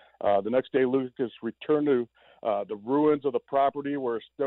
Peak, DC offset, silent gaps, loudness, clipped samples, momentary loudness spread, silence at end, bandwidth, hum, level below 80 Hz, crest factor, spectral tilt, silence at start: -14 dBFS; under 0.1%; none; -27 LUFS; under 0.1%; 8 LU; 0 s; 4.1 kHz; none; -72 dBFS; 12 dB; -10 dB/octave; 0.2 s